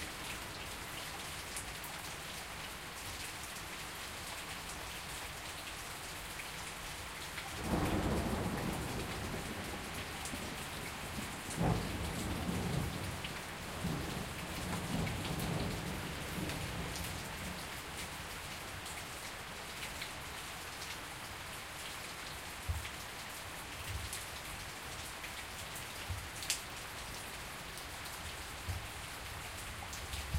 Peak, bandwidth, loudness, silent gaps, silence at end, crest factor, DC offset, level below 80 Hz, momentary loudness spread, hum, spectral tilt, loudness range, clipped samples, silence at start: -12 dBFS; 16 kHz; -41 LUFS; none; 0 s; 30 dB; under 0.1%; -52 dBFS; 6 LU; none; -3.5 dB/octave; 4 LU; under 0.1%; 0 s